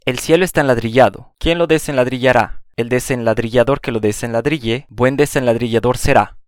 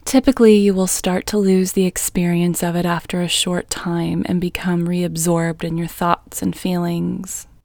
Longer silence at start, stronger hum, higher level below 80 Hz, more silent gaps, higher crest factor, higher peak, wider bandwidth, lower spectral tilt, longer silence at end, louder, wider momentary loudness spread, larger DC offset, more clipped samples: about the same, 0.05 s vs 0.05 s; neither; first, -34 dBFS vs -42 dBFS; neither; about the same, 16 dB vs 18 dB; about the same, 0 dBFS vs 0 dBFS; second, 17.5 kHz vs over 20 kHz; about the same, -5.5 dB/octave vs -5 dB/octave; about the same, 0.1 s vs 0.2 s; about the same, -16 LUFS vs -18 LUFS; second, 5 LU vs 9 LU; neither; neither